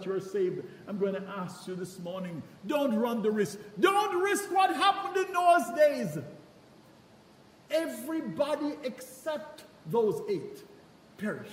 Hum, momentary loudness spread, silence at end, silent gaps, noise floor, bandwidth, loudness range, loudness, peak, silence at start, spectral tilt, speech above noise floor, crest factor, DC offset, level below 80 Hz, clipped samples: none; 15 LU; 0 s; none; -57 dBFS; 16 kHz; 9 LU; -30 LUFS; -12 dBFS; 0 s; -4.5 dB/octave; 27 dB; 20 dB; under 0.1%; -76 dBFS; under 0.1%